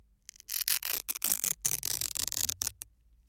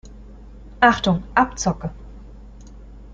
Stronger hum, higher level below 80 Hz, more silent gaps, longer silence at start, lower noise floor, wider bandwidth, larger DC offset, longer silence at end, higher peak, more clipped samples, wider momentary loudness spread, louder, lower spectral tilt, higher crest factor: neither; second, -60 dBFS vs -40 dBFS; neither; first, 0.5 s vs 0.05 s; first, -53 dBFS vs -40 dBFS; first, 17 kHz vs 9 kHz; neither; first, 0.45 s vs 0 s; second, -6 dBFS vs -2 dBFS; neither; second, 12 LU vs 16 LU; second, -31 LUFS vs -19 LUFS; second, 1 dB/octave vs -4.5 dB/octave; first, 28 dB vs 22 dB